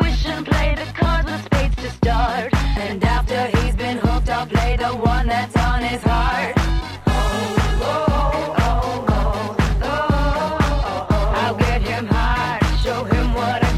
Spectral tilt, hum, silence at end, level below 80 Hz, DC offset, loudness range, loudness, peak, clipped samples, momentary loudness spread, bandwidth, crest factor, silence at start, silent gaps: -6 dB/octave; none; 0 s; -22 dBFS; under 0.1%; 1 LU; -20 LUFS; -4 dBFS; under 0.1%; 3 LU; 13 kHz; 14 dB; 0 s; none